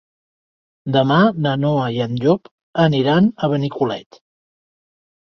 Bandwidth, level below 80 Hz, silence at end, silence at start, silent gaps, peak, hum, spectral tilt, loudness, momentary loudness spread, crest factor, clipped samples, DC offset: 6.6 kHz; -58 dBFS; 1.2 s; 0.85 s; 2.51-2.73 s; -2 dBFS; none; -8 dB/octave; -18 LUFS; 8 LU; 18 dB; under 0.1%; under 0.1%